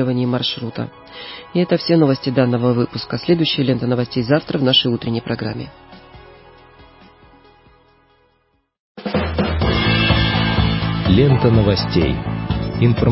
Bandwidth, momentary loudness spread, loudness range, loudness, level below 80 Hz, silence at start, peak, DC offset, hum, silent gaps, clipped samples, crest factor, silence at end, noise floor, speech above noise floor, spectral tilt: 5.8 kHz; 11 LU; 13 LU; -17 LUFS; -32 dBFS; 0 s; 0 dBFS; under 0.1%; none; 8.80-8.95 s; under 0.1%; 18 dB; 0 s; -63 dBFS; 46 dB; -10 dB/octave